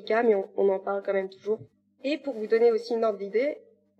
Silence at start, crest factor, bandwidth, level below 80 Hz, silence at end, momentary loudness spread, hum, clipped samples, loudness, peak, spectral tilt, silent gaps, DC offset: 0 s; 16 dB; 8.2 kHz; -84 dBFS; 0.4 s; 10 LU; none; under 0.1%; -27 LUFS; -12 dBFS; -6.5 dB/octave; none; under 0.1%